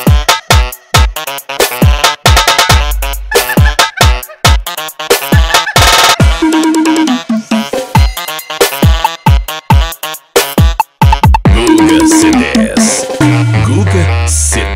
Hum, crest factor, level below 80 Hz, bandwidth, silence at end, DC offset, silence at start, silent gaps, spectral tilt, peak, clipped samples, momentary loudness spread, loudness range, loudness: none; 8 dB; -14 dBFS; 16.5 kHz; 0 s; under 0.1%; 0 s; none; -4 dB/octave; 0 dBFS; 0.7%; 8 LU; 3 LU; -9 LUFS